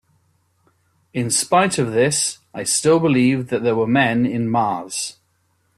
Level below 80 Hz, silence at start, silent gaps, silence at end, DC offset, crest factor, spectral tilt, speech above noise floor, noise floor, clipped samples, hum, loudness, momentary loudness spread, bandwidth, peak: -58 dBFS; 1.15 s; none; 0.65 s; under 0.1%; 16 dB; -4 dB/octave; 47 dB; -65 dBFS; under 0.1%; none; -18 LUFS; 10 LU; 14 kHz; -4 dBFS